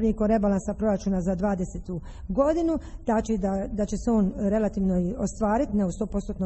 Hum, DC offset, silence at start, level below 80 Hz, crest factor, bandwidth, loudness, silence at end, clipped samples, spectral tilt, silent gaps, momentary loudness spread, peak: none; under 0.1%; 0 s; -38 dBFS; 14 dB; 8.6 kHz; -26 LUFS; 0 s; under 0.1%; -8 dB/octave; none; 7 LU; -10 dBFS